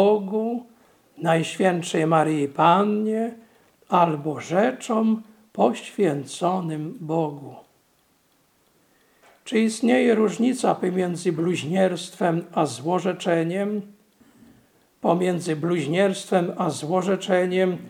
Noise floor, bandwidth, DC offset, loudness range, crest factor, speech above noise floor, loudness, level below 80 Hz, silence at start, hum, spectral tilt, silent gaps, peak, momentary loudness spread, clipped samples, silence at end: -64 dBFS; 15.5 kHz; under 0.1%; 5 LU; 20 dB; 42 dB; -23 LUFS; -74 dBFS; 0 s; none; -6 dB/octave; none; -4 dBFS; 8 LU; under 0.1%; 0 s